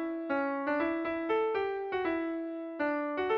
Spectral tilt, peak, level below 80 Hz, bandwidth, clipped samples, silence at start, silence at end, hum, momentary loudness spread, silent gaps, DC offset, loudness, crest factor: -7 dB/octave; -20 dBFS; -68 dBFS; 5.6 kHz; under 0.1%; 0 s; 0 s; none; 4 LU; none; under 0.1%; -33 LUFS; 12 dB